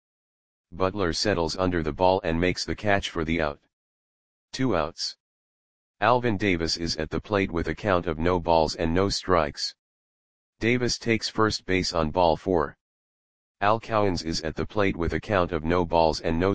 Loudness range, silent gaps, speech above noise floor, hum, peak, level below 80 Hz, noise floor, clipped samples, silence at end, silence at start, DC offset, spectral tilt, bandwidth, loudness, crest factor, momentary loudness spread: 3 LU; 3.73-4.48 s, 5.20-5.94 s, 9.79-10.53 s, 12.81-13.55 s; over 65 dB; none; -4 dBFS; -44 dBFS; under -90 dBFS; under 0.1%; 0 s; 0.65 s; 0.9%; -5 dB/octave; 10 kHz; -25 LUFS; 22 dB; 7 LU